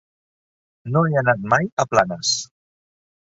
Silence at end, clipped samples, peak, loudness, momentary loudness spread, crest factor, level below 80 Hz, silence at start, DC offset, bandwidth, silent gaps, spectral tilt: 0.85 s; under 0.1%; -2 dBFS; -20 LUFS; 8 LU; 20 dB; -58 dBFS; 0.85 s; under 0.1%; 7.8 kHz; 1.72-1.77 s; -4 dB/octave